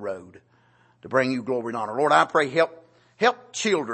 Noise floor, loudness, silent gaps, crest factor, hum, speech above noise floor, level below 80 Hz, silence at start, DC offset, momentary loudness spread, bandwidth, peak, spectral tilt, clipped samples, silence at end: -60 dBFS; -23 LUFS; none; 22 dB; none; 37 dB; -74 dBFS; 0 s; under 0.1%; 9 LU; 8.8 kHz; -2 dBFS; -4 dB/octave; under 0.1%; 0 s